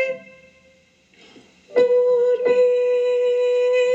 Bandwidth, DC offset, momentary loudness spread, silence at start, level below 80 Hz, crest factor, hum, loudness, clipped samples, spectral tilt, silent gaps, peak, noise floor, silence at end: 7.8 kHz; under 0.1%; 6 LU; 0 s; -72 dBFS; 14 dB; none; -18 LUFS; under 0.1%; -3.5 dB/octave; none; -6 dBFS; -56 dBFS; 0 s